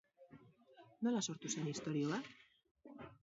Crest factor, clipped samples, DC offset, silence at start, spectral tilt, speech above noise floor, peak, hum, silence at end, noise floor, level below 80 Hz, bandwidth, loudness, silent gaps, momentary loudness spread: 18 dB; under 0.1%; under 0.1%; 0.2 s; -5.5 dB/octave; 25 dB; -26 dBFS; none; 0.1 s; -66 dBFS; -82 dBFS; 7.6 kHz; -41 LUFS; 2.71-2.75 s; 22 LU